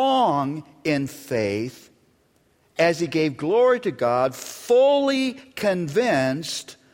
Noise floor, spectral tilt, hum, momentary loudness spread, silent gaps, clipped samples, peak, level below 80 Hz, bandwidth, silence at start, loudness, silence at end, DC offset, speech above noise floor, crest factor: -63 dBFS; -5 dB/octave; none; 11 LU; none; under 0.1%; -6 dBFS; -64 dBFS; 16.5 kHz; 0 s; -22 LUFS; 0.2 s; under 0.1%; 41 dB; 16 dB